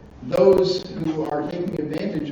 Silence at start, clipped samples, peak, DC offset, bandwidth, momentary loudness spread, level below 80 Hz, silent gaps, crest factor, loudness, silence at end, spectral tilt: 0 s; under 0.1%; -4 dBFS; under 0.1%; 9.4 kHz; 11 LU; -50 dBFS; none; 18 dB; -22 LUFS; 0 s; -7 dB/octave